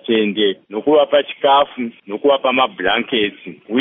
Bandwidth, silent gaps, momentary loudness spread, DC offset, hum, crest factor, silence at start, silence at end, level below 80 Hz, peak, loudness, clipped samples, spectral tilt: 3.9 kHz; none; 8 LU; under 0.1%; none; 14 dB; 0.05 s; 0 s; -56 dBFS; -2 dBFS; -16 LUFS; under 0.1%; -1.5 dB/octave